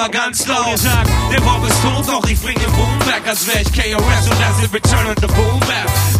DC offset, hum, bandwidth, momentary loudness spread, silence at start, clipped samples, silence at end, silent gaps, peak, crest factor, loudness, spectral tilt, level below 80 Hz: under 0.1%; none; 16 kHz; 2 LU; 0 s; under 0.1%; 0 s; none; 0 dBFS; 14 dB; -14 LUFS; -4 dB/octave; -22 dBFS